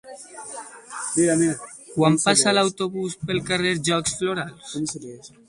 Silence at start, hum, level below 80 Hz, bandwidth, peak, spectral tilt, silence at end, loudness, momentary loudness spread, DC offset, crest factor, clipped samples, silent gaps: 0.05 s; none; -58 dBFS; 11.5 kHz; -4 dBFS; -3.5 dB/octave; 0.2 s; -22 LUFS; 19 LU; under 0.1%; 20 dB; under 0.1%; none